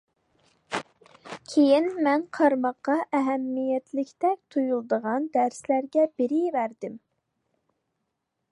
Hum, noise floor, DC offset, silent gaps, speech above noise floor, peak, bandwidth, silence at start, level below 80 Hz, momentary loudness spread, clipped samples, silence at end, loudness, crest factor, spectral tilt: none; -80 dBFS; under 0.1%; none; 55 dB; -8 dBFS; 11 kHz; 0.7 s; -78 dBFS; 12 LU; under 0.1%; 1.55 s; -25 LUFS; 18 dB; -5 dB/octave